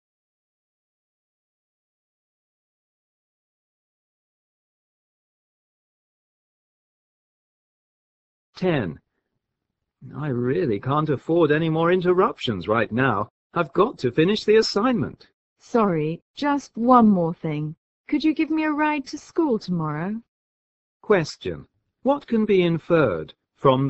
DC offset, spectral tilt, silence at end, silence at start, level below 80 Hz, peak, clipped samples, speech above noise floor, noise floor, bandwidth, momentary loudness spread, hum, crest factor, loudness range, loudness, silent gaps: under 0.1%; -7 dB/octave; 0 s; 8.55 s; -58 dBFS; -2 dBFS; under 0.1%; 60 dB; -81 dBFS; 8.2 kHz; 11 LU; none; 22 dB; 11 LU; -22 LUFS; 13.30-13.50 s, 15.34-15.56 s, 16.22-16.34 s, 17.77-18.04 s, 20.28-21.00 s